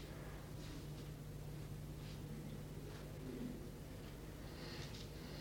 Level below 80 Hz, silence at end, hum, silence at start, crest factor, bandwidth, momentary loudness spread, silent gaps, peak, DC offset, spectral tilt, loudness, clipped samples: -58 dBFS; 0 s; none; 0 s; 14 dB; 19.5 kHz; 3 LU; none; -36 dBFS; under 0.1%; -5.5 dB/octave; -51 LUFS; under 0.1%